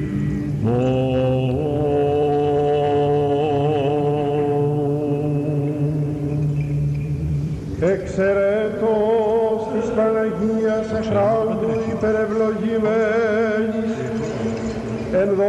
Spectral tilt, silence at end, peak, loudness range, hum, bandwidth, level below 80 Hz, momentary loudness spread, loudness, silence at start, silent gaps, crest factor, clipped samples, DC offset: -8 dB/octave; 0 s; -10 dBFS; 2 LU; none; 10 kHz; -40 dBFS; 5 LU; -20 LUFS; 0 s; none; 10 dB; under 0.1%; under 0.1%